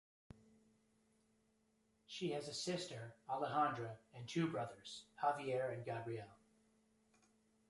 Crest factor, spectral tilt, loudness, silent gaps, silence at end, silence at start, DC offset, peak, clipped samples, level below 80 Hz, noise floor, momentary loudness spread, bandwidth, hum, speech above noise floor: 22 dB; -5 dB/octave; -43 LUFS; none; 1.35 s; 2.1 s; under 0.1%; -24 dBFS; under 0.1%; -80 dBFS; -79 dBFS; 14 LU; 11.5 kHz; none; 36 dB